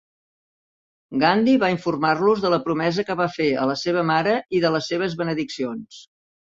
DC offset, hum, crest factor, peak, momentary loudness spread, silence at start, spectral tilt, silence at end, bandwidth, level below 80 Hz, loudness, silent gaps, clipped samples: under 0.1%; none; 20 dB; -2 dBFS; 8 LU; 1.1 s; -6 dB/octave; 0.55 s; 7.8 kHz; -62 dBFS; -21 LUFS; none; under 0.1%